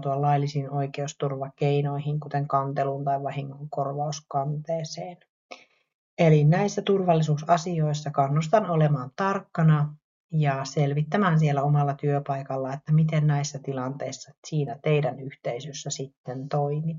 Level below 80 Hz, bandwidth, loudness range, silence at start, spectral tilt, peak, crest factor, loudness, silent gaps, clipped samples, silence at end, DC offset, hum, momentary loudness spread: -64 dBFS; 7.4 kHz; 6 LU; 0 s; -7 dB/octave; -8 dBFS; 18 dB; -26 LUFS; 5.29-5.49 s, 5.94-6.17 s, 10.04-10.29 s, 14.38-14.42 s, 16.17-16.24 s; under 0.1%; 0 s; under 0.1%; none; 11 LU